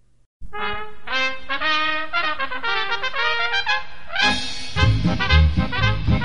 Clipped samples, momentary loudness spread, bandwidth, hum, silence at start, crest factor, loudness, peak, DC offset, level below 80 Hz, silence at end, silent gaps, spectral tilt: under 0.1%; 10 LU; 10 kHz; none; 0 s; 20 dB; -21 LUFS; -2 dBFS; 5%; -28 dBFS; 0 s; 0.26-0.40 s; -5 dB/octave